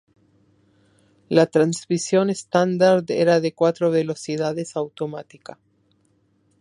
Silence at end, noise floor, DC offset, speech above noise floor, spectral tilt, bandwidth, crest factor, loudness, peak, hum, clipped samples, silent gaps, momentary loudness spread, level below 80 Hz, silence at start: 1.4 s; -64 dBFS; under 0.1%; 43 dB; -5.5 dB/octave; 11.5 kHz; 20 dB; -21 LUFS; -2 dBFS; none; under 0.1%; none; 13 LU; -68 dBFS; 1.3 s